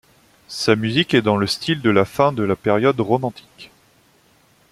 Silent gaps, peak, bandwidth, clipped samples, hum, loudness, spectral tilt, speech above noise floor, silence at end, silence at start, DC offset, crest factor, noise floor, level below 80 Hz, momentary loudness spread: none; -2 dBFS; 15 kHz; under 0.1%; none; -18 LUFS; -5.5 dB/octave; 38 dB; 1.05 s; 0.5 s; under 0.1%; 18 dB; -56 dBFS; -56 dBFS; 6 LU